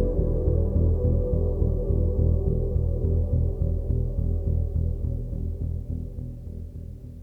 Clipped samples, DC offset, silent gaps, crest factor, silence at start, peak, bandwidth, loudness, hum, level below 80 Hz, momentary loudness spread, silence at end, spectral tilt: under 0.1%; under 0.1%; none; 14 dB; 0 s; -10 dBFS; 1.3 kHz; -26 LUFS; none; -28 dBFS; 13 LU; 0 s; -12.5 dB/octave